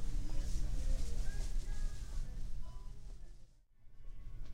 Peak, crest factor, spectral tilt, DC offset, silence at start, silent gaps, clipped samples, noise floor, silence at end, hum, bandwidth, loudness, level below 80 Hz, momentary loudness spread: -24 dBFS; 12 dB; -5 dB/octave; under 0.1%; 0 s; none; under 0.1%; -57 dBFS; 0 s; none; 10.5 kHz; -46 LUFS; -38 dBFS; 16 LU